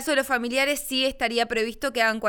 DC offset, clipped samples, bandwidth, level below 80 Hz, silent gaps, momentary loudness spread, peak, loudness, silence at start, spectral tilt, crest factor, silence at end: under 0.1%; under 0.1%; over 20 kHz; -50 dBFS; none; 3 LU; -8 dBFS; -24 LUFS; 0 s; -2 dB/octave; 16 dB; 0 s